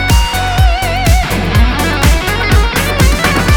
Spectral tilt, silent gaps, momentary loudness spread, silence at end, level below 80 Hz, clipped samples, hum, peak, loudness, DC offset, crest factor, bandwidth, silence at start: -4.5 dB/octave; none; 2 LU; 0 s; -14 dBFS; under 0.1%; none; 0 dBFS; -12 LUFS; under 0.1%; 10 dB; 19.5 kHz; 0 s